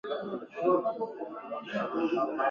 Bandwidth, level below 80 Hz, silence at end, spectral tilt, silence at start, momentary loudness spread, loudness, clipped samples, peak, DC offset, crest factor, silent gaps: 7 kHz; -76 dBFS; 0 s; -7 dB/octave; 0.05 s; 11 LU; -32 LUFS; under 0.1%; -14 dBFS; under 0.1%; 16 dB; none